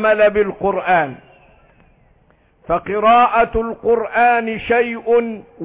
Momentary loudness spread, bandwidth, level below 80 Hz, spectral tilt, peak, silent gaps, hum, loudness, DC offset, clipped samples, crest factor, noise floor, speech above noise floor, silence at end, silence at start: 8 LU; 4 kHz; -42 dBFS; -9 dB/octave; -4 dBFS; none; none; -16 LUFS; under 0.1%; under 0.1%; 12 dB; -55 dBFS; 39 dB; 0 s; 0 s